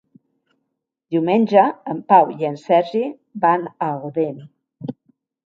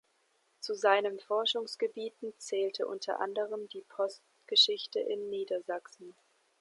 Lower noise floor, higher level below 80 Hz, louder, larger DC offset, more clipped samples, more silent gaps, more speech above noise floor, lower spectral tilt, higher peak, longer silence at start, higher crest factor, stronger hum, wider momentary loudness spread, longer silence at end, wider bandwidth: first, -77 dBFS vs -73 dBFS; first, -70 dBFS vs under -90 dBFS; first, -19 LUFS vs -32 LUFS; neither; neither; neither; first, 59 dB vs 40 dB; first, -8 dB/octave vs -1.5 dB/octave; first, 0 dBFS vs -12 dBFS; first, 1.1 s vs 0.6 s; about the same, 20 dB vs 22 dB; neither; first, 19 LU vs 15 LU; about the same, 0.55 s vs 0.5 s; second, 7.2 kHz vs 11.5 kHz